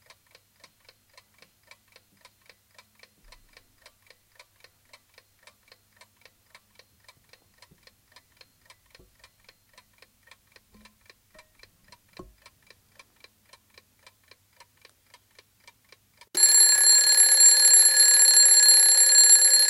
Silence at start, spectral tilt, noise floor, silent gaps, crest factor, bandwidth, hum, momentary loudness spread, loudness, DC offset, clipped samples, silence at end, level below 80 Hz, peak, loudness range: 16.35 s; 4.5 dB/octave; -61 dBFS; none; 20 dB; 17 kHz; none; 3 LU; -14 LUFS; under 0.1%; under 0.1%; 0 s; -68 dBFS; -6 dBFS; 10 LU